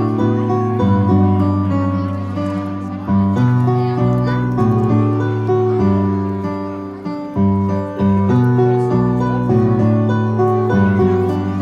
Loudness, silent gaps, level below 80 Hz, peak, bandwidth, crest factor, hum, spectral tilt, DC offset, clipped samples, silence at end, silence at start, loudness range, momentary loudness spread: -16 LUFS; none; -44 dBFS; -2 dBFS; 7 kHz; 12 dB; none; -10 dB/octave; under 0.1%; under 0.1%; 0 s; 0 s; 2 LU; 8 LU